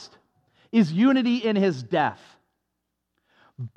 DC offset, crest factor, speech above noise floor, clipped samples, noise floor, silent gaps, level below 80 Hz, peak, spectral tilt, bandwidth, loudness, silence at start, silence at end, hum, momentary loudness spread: under 0.1%; 16 dB; 58 dB; under 0.1%; -80 dBFS; none; -80 dBFS; -10 dBFS; -7 dB/octave; 8.2 kHz; -22 LUFS; 0 s; 0.1 s; none; 6 LU